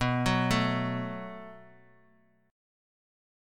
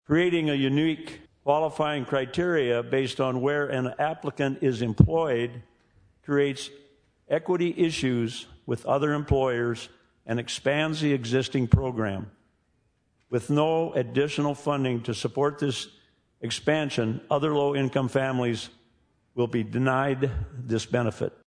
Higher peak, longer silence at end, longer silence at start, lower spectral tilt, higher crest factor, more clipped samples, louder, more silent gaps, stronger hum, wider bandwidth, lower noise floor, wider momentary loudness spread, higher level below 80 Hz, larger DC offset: second, -12 dBFS vs -2 dBFS; first, 1.85 s vs 0.15 s; about the same, 0 s vs 0.1 s; about the same, -5.5 dB/octave vs -6.5 dB/octave; about the same, 20 dB vs 24 dB; neither; second, -29 LUFS vs -26 LUFS; neither; neither; first, 16.5 kHz vs 10.5 kHz; second, -66 dBFS vs -70 dBFS; first, 18 LU vs 10 LU; about the same, -50 dBFS vs -46 dBFS; neither